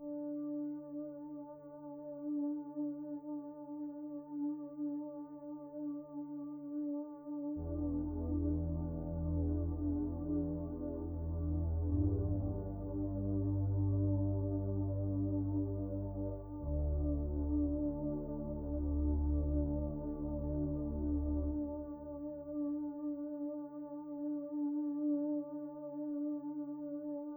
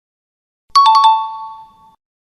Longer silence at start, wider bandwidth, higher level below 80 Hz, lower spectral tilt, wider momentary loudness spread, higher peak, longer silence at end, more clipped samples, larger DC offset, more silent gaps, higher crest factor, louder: second, 0 s vs 0.75 s; second, 1.6 kHz vs 12 kHz; first, -44 dBFS vs -66 dBFS; first, -14.5 dB/octave vs 2.5 dB/octave; second, 10 LU vs 21 LU; second, -24 dBFS vs 0 dBFS; second, 0 s vs 0.7 s; neither; neither; neither; about the same, 14 dB vs 16 dB; second, -39 LUFS vs -11 LUFS